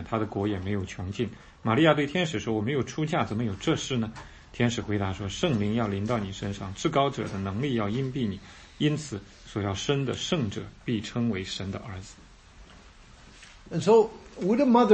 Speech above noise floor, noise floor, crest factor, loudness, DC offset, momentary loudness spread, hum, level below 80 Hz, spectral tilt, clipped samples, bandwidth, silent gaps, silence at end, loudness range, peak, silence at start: 24 dB; -51 dBFS; 22 dB; -28 LUFS; under 0.1%; 14 LU; none; -52 dBFS; -6 dB/octave; under 0.1%; 8.8 kHz; none; 0 s; 4 LU; -6 dBFS; 0 s